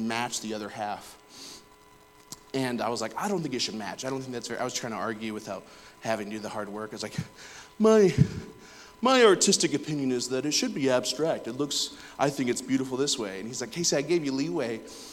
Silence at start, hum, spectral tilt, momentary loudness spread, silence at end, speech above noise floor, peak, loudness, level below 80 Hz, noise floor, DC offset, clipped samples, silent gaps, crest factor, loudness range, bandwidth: 0 s; none; -4 dB/octave; 19 LU; 0 s; 28 dB; -6 dBFS; -28 LUFS; -60 dBFS; -55 dBFS; under 0.1%; under 0.1%; none; 22 dB; 10 LU; 17 kHz